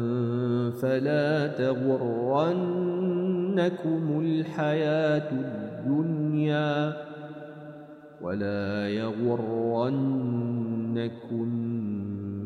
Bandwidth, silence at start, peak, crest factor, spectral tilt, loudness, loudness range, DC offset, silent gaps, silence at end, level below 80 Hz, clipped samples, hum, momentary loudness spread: 13.5 kHz; 0 s; -14 dBFS; 14 dB; -8.5 dB/octave; -28 LUFS; 4 LU; under 0.1%; none; 0 s; -74 dBFS; under 0.1%; none; 9 LU